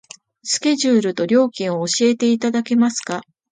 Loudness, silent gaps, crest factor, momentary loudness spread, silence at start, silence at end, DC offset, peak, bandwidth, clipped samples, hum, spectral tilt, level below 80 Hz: -18 LUFS; none; 14 dB; 9 LU; 0.45 s; 0.3 s; under 0.1%; -4 dBFS; 9.4 kHz; under 0.1%; none; -4 dB/octave; -68 dBFS